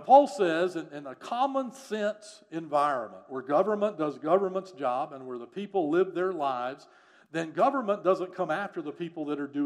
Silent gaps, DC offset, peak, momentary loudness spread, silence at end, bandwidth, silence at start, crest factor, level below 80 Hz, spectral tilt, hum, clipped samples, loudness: none; under 0.1%; -6 dBFS; 12 LU; 0 s; 12 kHz; 0 s; 22 dB; -88 dBFS; -6 dB/octave; none; under 0.1%; -29 LUFS